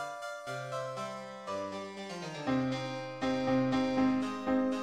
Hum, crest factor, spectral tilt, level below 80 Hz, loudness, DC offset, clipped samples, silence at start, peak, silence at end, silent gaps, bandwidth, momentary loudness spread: none; 16 dB; -6 dB/octave; -64 dBFS; -34 LUFS; under 0.1%; under 0.1%; 0 s; -18 dBFS; 0 s; none; 11 kHz; 11 LU